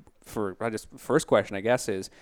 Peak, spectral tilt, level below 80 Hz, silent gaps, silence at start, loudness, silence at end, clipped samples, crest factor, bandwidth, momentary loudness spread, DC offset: -8 dBFS; -5 dB/octave; -58 dBFS; none; 0.25 s; -28 LUFS; 0.15 s; under 0.1%; 20 dB; 19.5 kHz; 11 LU; under 0.1%